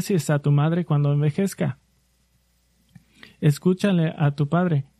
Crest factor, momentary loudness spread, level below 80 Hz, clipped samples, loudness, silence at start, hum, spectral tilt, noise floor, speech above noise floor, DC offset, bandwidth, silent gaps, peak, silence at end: 14 dB; 5 LU; -62 dBFS; under 0.1%; -22 LUFS; 0 s; none; -7.5 dB/octave; -64 dBFS; 43 dB; under 0.1%; 13.5 kHz; none; -8 dBFS; 0.15 s